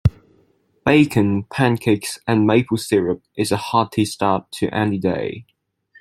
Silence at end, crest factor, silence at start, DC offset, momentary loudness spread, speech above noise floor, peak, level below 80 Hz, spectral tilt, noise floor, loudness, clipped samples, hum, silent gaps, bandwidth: 0.6 s; 18 dB; 0.05 s; under 0.1%; 8 LU; 41 dB; -2 dBFS; -44 dBFS; -6 dB/octave; -60 dBFS; -19 LUFS; under 0.1%; none; none; 14.5 kHz